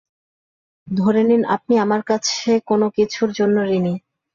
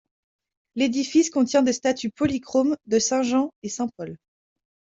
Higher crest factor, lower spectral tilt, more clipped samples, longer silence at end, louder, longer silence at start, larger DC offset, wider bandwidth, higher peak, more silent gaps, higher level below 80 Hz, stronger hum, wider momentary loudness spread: about the same, 14 dB vs 16 dB; first, -5.5 dB/octave vs -3.5 dB/octave; neither; second, 0.35 s vs 0.75 s; first, -18 LUFS vs -23 LUFS; about the same, 0.85 s vs 0.75 s; neither; about the same, 7.4 kHz vs 7.8 kHz; about the same, -6 dBFS vs -8 dBFS; second, none vs 3.56-3.62 s; about the same, -60 dBFS vs -64 dBFS; neither; second, 5 LU vs 9 LU